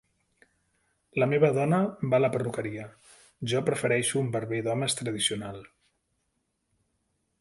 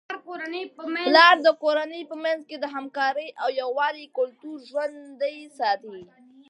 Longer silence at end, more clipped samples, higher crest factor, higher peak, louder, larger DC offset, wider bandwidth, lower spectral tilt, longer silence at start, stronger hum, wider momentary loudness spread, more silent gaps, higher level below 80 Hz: first, 1.75 s vs 0.45 s; neither; about the same, 20 dB vs 22 dB; second, -10 dBFS vs -2 dBFS; second, -27 LUFS vs -24 LUFS; neither; about the same, 11.5 kHz vs 11 kHz; first, -4.5 dB/octave vs -2.5 dB/octave; first, 1.15 s vs 0.1 s; neither; second, 14 LU vs 18 LU; neither; first, -66 dBFS vs -84 dBFS